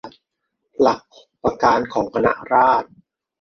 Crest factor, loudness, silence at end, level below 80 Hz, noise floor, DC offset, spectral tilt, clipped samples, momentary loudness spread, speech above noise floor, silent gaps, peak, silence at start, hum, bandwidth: 18 dB; -19 LUFS; 0.55 s; -52 dBFS; -76 dBFS; under 0.1%; -6 dB/octave; under 0.1%; 12 LU; 59 dB; none; -2 dBFS; 0.05 s; none; 6.6 kHz